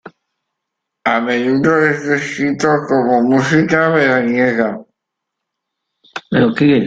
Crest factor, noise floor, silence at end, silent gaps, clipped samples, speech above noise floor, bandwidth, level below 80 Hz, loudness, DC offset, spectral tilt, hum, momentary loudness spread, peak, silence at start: 14 dB; -78 dBFS; 0 s; none; under 0.1%; 65 dB; 9 kHz; -54 dBFS; -14 LUFS; under 0.1%; -6.5 dB/octave; none; 7 LU; 0 dBFS; 0.05 s